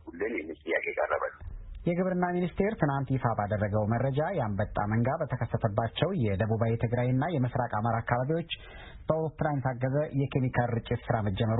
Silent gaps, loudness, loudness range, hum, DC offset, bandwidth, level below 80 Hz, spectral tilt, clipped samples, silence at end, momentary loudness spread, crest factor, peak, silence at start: none; -30 LUFS; 1 LU; none; under 0.1%; 4 kHz; -50 dBFS; -11.5 dB/octave; under 0.1%; 0 s; 5 LU; 20 dB; -10 dBFS; 0.05 s